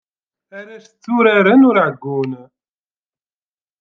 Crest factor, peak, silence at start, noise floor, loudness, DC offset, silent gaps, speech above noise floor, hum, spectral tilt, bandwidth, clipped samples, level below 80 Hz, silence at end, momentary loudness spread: 16 dB; -2 dBFS; 0.55 s; under -90 dBFS; -14 LUFS; under 0.1%; none; over 76 dB; none; -8 dB/octave; 6.2 kHz; under 0.1%; -66 dBFS; 1.4 s; 25 LU